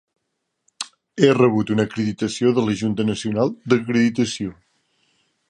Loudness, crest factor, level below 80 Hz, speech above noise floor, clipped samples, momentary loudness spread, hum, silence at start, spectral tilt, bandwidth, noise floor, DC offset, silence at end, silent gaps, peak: -20 LUFS; 20 dB; -56 dBFS; 57 dB; under 0.1%; 14 LU; none; 0.8 s; -6 dB/octave; 10.5 kHz; -76 dBFS; under 0.1%; 0.95 s; none; -2 dBFS